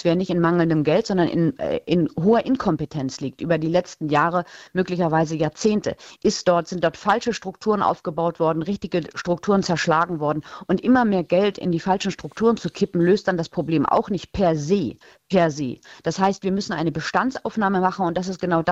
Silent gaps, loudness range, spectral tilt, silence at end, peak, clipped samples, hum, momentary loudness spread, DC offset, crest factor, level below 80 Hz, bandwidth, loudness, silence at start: none; 2 LU; -6 dB/octave; 0 s; -4 dBFS; under 0.1%; none; 7 LU; under 0.1%; 16 dB; -52 dBFS; 8 kHz; -22 LUFS; 0 s